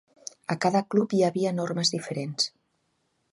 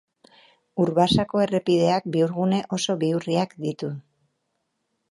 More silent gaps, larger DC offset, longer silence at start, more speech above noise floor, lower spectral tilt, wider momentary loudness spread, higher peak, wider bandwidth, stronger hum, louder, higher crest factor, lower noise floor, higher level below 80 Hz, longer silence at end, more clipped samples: neither; neither; second, 0.5 s vs 0.75 s; second, 48 dB vs 53 dB; second, -4.5 dB/octave vs -6 dB/octave; about the same, 9 LU vs 11 LU; second, -10 dBFS vs -6 dBFS; about the same, 11.5 kHz vs 11.5 kHz; neither; second, -26 LUFS vs -23 LUFS; about the same, 18 dB vs 20 dB; about the same, -73 dBFS vs -76 dBFS; second, -76 dBFS vs -56 dBFS; second, 0.85 s vs 1.1 s; neither